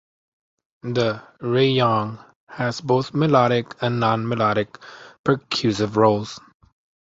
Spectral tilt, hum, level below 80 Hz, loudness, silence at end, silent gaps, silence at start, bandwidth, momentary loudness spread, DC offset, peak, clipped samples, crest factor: -6.5 dB/octave; none; -58 dBFS; -21 LUFS; 0.7 s; 2.36-2.47 s, 5.19-5.24 s; 0.85 s; 7.8 kHz; 17 LU; under 0.1%; -2 dBFS; under 0.1%; 20 dB